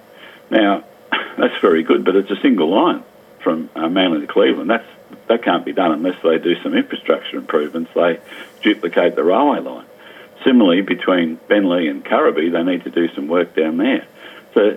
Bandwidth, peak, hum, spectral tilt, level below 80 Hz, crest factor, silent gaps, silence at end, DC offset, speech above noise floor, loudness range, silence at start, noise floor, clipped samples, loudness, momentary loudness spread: 12.5 kHz; 0 dBFS; none; -7 dB/octave; -68 dBFS; 16 dB; none; 0 s; under 0.1%; 25 dB; 2 LU; 0.2 s; -42 dBFS; under 0.1%; -17 LUFS; 7 LU